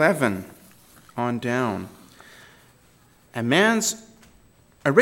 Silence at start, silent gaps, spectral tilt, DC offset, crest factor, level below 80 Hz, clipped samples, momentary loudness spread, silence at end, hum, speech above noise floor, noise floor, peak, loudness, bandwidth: 0 s; none; -4 dB/octave; under 0.1%; 24 dB; -64 dBFS; under 0.1%; 18 LU; 0 s; none; 34 dB; -56 dBFS; -2 dBFS; -23 LUFS; 17 kHz